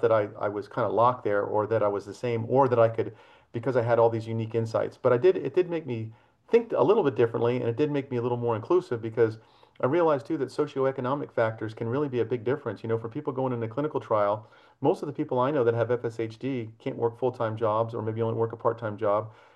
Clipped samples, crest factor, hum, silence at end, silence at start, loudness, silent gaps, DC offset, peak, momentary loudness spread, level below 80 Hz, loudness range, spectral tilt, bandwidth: under 0.1%; 18 dB; none; 0.25 s; 0 s; -27 LUFS; none; under 0.1%; -8 dBFS; 9 LU; -72 dBFS; 4 LU; -8.5 dB/octave; 9.4 kHz